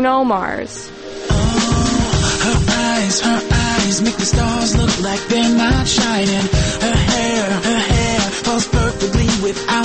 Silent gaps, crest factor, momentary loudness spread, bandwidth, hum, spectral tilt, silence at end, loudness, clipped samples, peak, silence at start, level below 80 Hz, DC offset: none; 12 dB; 4 LU; 8.8 kHz; none; -4 dB/octave; 0 s; -16 LUFS; under 0.1%; -4 dBFS; 0 s; -26 dBFS; under 0.1%